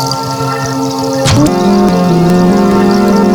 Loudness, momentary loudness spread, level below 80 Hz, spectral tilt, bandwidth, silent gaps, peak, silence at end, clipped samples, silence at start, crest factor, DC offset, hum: -10 LUFS; 6 LU; -32 dBFS; -6 dB/octave; 19.5 kHz; none; 0 dBFS; 0 s; under 0.1%; 0 s; 8 dB; under 0.1%; none